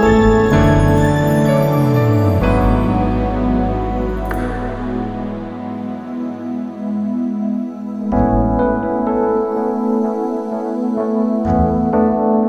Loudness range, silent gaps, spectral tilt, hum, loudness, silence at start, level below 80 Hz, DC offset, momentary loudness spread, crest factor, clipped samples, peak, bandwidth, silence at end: 9 LU; none; -8.5 dB/octave; none; -17 LUFS; 0 s; -26 dBFS; under 0.1%; 12 LU; 14 dB; under 0.1%; -2 dBFS; 15.5 kHz; 0 s